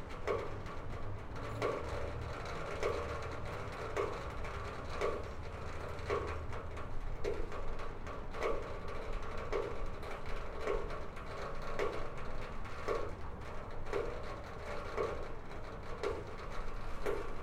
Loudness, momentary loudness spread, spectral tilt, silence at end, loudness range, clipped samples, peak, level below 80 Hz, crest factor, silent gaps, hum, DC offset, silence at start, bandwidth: -42 LUFS; 7 LU; -6 dB/octave; 0 s; 2 LU; under 0.1%; -22 dBFS; -44 dBFS; 16 dB; none; none; under 0.1%; 0 s; 10.5 kHz